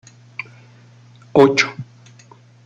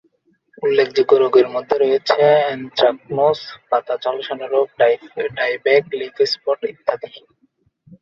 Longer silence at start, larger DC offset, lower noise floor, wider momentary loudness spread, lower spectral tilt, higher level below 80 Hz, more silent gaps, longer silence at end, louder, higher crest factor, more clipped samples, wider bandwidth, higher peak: second, 0.4 s vs 0.6 s; neither; second, -47 dBFS vs -62 dBFS; first, 25 LU vs 10 LU; about the same, -5 dB/octave vs -5 dB/octave; about the same, -62 dBFS vs -64 dBFS; neither; about the same, 0.8 s vs 0.85 s; first, -15 LUFS vs -18 LUFS; about the same, 20 dB vs 16 dB; neither; first, 8.2 kHz vs 7.2 kHz; about the same, 0 dBFS vs -2 dBFS